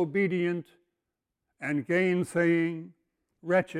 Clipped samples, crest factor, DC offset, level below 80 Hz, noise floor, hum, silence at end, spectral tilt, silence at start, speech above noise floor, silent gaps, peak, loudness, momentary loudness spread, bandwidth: under 0.1%; 16 dB; under 0.1%; -72 dBFS; -86 dBFS; none; 0 s; -7 dB/octave; 0 s; 58 dB; none; -12 dBFS; -28 LUFS; 12 LU; 12 kHz